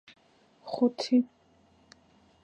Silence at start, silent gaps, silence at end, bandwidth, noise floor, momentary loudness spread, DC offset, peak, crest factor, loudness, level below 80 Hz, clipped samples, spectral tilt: 0.65 s; none; 1.2 s; 8.4 kHz; -63 dBFS; 15 LU; under 0.1%; -14 dBFS; 18 dB; -29 LUFS; -76 dBFS; under 0.1%; -5 dB/octave